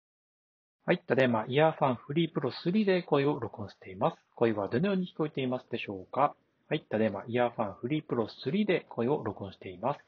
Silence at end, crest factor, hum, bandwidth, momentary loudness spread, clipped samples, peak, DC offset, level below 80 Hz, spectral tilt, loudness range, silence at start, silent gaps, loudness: 0.1 s; 20 dB; none; 6.8 kHz; 10 LU; under 0.1%; -10 dBFS; under 0.1%; -72 dBFS; -5.5 dB/octave; 3 LU; 0.85 s; none; -31 LUFS